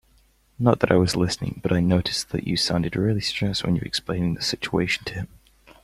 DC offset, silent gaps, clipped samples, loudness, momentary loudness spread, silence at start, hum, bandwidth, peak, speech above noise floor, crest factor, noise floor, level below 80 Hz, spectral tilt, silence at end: under 0.1%; none; under 0.1%; -23 LUFS; 7 LU; 0.6 s; none; 15 kHz; -2 dBFS; 37 dB; 22 dB; -60 dBFS; -46 dBFS; -5 dB/octave; 0.55 s